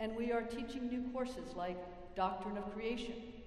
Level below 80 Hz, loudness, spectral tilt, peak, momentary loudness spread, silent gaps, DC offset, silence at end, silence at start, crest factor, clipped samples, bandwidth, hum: -60 dBFS; -41 LUFS; -6 dB/octave; -22 dBFS; 6 LU; none; under 0.1%; 0 s; 0 s; 18 dB; under 0.1%; 12 kHz; none